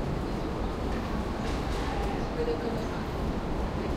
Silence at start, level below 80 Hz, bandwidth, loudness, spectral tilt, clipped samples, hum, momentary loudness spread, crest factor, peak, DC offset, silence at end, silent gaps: 0 s; -36 dBFS; 15.5 kHz; -32 LUFS; -6.5 dB/octave; under 0.1%; none; 2 LU; 12 dB; -18 dBFS; under 0.1%; 0 s; none